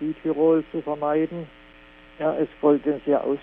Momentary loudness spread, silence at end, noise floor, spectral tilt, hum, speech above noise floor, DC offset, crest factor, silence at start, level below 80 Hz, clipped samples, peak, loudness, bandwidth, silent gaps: 9 LU; 0 s; -49 dBFS; -10.5 dB/octave; 60 Hz at -65 dBFS; 26 dB; under 0.1%; 16 dB; 0 s; -56 dBFS; under 0.1%; -8 dBFS; -23 LUFS; 3.8 kHz; none